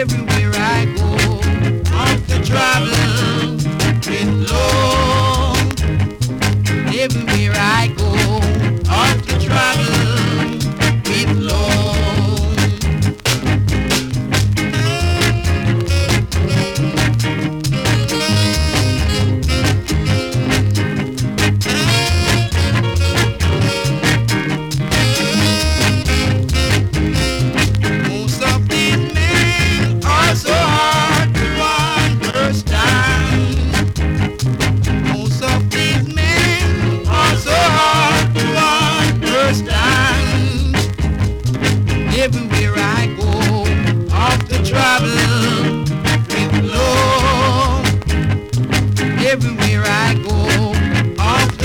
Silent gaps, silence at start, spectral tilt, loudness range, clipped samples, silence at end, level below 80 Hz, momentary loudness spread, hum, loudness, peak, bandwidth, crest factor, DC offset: none; 0 s; -5 dB/octave; 2 LU; under 0.1%; 0 s; -24 dBFS; 4 LU; none; -15 LUFS; 0 dBFS; 18.5 kHz; 14 dB; under 0.1%